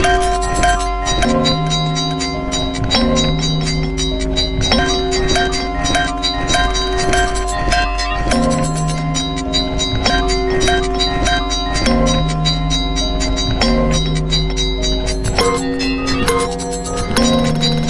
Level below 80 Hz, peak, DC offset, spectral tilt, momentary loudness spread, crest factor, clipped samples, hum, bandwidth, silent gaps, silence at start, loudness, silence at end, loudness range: -22 dBFS; 0 dBFS; under 0.1%; -4 dB/octave; 4 LU; 16 dB; under 0.1%; none; 11.5 kHz; none; 0 s; -16 LUFS; 0 s; 1 LU